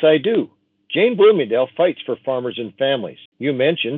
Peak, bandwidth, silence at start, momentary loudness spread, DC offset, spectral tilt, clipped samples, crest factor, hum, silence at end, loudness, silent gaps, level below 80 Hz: -2 dBFS; 4.1 kHz; 0 s; 12 LU; under 0.1%; -9 dB/octave; under 0.1%; 16 dB; none; 0 s; -18 LUFS; 3.25-3.32 s; -76 dBFS